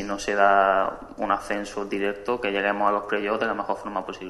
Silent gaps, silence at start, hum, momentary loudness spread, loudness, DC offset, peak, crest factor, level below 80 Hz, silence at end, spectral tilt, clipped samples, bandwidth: none; 0 s; none; 10 LU; -24 LUFS; under 0.1%; -4 dBFS; 20 dB; -52 dBFS; 0 s; -4 dB/octave; under 0.1%; 12 kHz